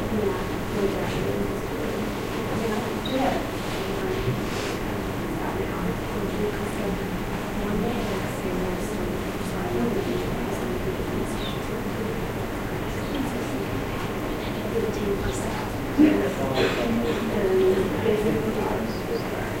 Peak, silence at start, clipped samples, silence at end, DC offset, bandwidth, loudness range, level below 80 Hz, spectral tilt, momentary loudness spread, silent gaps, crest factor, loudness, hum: -6 dBFS; 0 s; under 0.1%; 0 s; under 0.1%; 16 kHz; 5 LU; -38 dBFS; -6 dB/octave; 6 LU; none; 20 dB; -26 LUFS; none